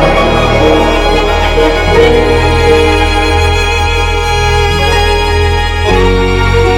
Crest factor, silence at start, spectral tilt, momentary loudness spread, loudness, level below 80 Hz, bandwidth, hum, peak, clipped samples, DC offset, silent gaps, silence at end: 8 dB; 0 s; -5 dB/octave; 3 LU; -9 LUFS; -14 dBFS; 15.5 kHz; none; 0 dBFS; 1%; under 0.1%; none; 0 s